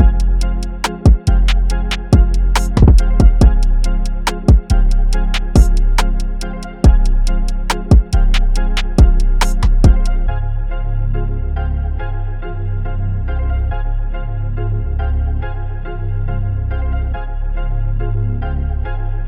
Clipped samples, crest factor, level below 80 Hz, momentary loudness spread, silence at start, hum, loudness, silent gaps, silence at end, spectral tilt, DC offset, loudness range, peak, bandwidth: under 0.1%; 12 dB; -14 dBFS; 10 LU; 0 s; none; -17 LUFS; none; 0 s; -6.5 dB/octave; under 0.1%; 8 LU; 0 dBFS; 10.5 kHz